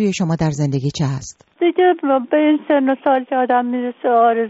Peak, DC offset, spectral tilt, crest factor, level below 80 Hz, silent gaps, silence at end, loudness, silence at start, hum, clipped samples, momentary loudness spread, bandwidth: -4 dBFS; under 0.1%; -6 dB/octave; 12 dB; -50 dBFS; none; 0 s; -17 LUFS; 0 s; none; under 0.1%; 7 LU; 8 kHz